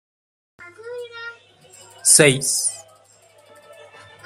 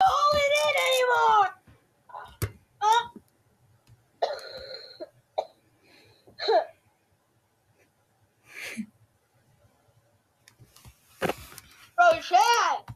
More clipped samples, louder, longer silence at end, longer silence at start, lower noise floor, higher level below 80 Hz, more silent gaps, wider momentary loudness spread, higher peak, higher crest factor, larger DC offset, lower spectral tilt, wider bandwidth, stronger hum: neither; first, -15 LUFS vs -25 LUFS; first, 1.45 s vs 0 s; first, 0.6 s vs 0 s; second, -53 dBFS vs -69 dBFS; second, -66 dBFS vs -60 dBFS; neither; about the same, 25 LU vs 24 LU; first, 0 dBFS vs -8 dBFS; about the same, 24 dB vs 20 dB; neither; about the same, -2 dB/octave vs -2.5 dB/octave; about the same, 16 kHz vs 15.5 kHz; neither